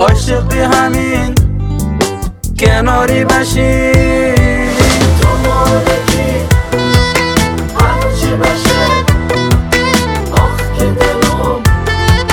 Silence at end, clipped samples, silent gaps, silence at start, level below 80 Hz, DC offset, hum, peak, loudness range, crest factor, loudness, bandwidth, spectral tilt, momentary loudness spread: 0 s; 0.8%; none; 0 s; -18 dBFS; under 0.1%; none; 0 dBFS; 2 LU; 10 dB; -11 LUFS; over 20 kHz; -5 dB/octave; 4 LU